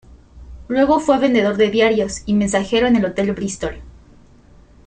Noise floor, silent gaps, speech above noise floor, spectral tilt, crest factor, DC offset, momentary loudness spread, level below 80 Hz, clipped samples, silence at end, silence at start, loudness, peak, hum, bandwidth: -47 dBFS; none; 30 dB; -5 dB/octave; 16 dB; under 0.1%; 9 LU; -42 dBFS; under 0.1%; 0.95 s; 0.35 s; -17 LUFS; -2 dBFS; none; 9.4 kHz